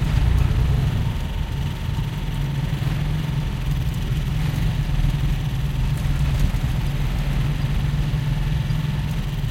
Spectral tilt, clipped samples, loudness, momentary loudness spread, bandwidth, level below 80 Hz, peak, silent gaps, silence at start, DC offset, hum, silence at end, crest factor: -6.5 dB/octave; under 0.1%; -23 LUFS; 5 LU; 16.5 kHz; -24 dBFS; -6 dBFS; none; 0 s; under 0.1%; none; 0 s; 16 dB